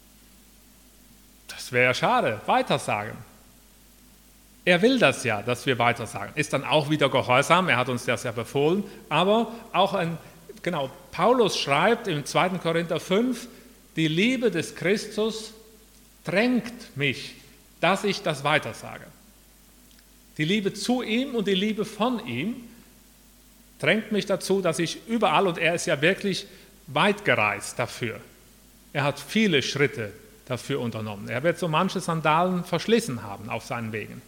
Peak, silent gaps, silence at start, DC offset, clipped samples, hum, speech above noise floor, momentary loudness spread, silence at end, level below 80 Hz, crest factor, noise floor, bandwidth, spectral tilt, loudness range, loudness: -2 dBFS; none; 1.5 s; under 0.1%; under 0.1%; none; 29 dB; 12 LU; 0.05 s; -58 dBFS; 24 dB; -54 dBFS; 18 kHz; -4.5 dB/octave; 5 LU; -24 LUFS